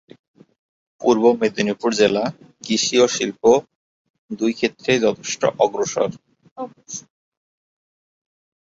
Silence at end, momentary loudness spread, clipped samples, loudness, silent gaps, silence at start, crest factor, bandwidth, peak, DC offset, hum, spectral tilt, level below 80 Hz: 1.65 s; 17 LU; under 0.1%; -19 LUFS; 3.75-4.29 s, 6.51-6.56 s; 1 s; 18 dB; 8 kHz; -2 dBFS; under 0.1%; none; -3.5 dB/octave; -62 dBFS